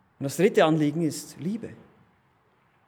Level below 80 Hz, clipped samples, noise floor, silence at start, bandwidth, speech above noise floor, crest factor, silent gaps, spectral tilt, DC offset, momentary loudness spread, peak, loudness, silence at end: -76 dBFS; under 0.1%; -65 dBFS; 0.2 s; 19 kHz; 40 dB; 20 dB; none; -6 dB/octave; under 0.1%; 14 LU; -6 dBFS; -25 LUFS; 1.1 s